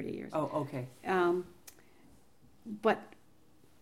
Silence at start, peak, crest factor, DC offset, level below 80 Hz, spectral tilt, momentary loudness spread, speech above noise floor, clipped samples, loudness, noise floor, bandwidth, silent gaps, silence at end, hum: 0 s; -16 dBFS; 20 dB; under 0.1%; -72 dBFS; -6.5 dB/octave; 22 LU; 32 dB; under 0.1%; -34 LUFS; -65 dBFS; 16.5 kHz; none; 0.75 s; none